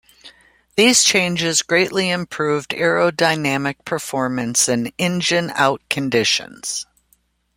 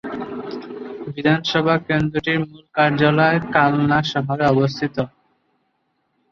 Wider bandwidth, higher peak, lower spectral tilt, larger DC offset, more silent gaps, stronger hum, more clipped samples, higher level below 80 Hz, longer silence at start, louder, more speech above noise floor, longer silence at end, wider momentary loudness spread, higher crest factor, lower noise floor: first, 16.5 kHz vs 7.2 kHz; about the same, 0 dBFS vs 0 dBFS; second, -2.5 dB/octave vs -7 dB/octave; neither; neither; neither; neither; second, -58 dBFS vs -52 dBFS; first, 0.25 s vs 0.05 s; about the same, -18 LUFS vs -19 LUFS; second, 43 dB vs 51 dB; second, 0.75 s vs 1.25 s; second, 11 LU vs 15 LU; about the same, 18 dB vs 20 dB; second, -62 dBFS vs -69 dBFS